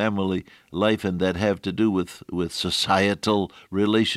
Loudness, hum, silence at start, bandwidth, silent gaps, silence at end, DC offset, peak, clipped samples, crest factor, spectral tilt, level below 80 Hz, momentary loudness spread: -24 LUFS; none; 0 s; 15 kHz; none; 0 s; under 0.1%; -6 dBFS; under 0.1%; 18 dB; -5 dB/octave; -58 dBFS; 9 LU